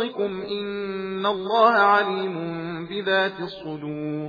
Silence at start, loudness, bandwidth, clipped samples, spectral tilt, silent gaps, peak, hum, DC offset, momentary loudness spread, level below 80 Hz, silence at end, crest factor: 0 s; -23 LUFS; 5 kHz; under 0.1%; -7 dB/octave; none; -4 dBFS; none; under 0.1%; 14 LU; -64 dBFS; 0 s; 20 dB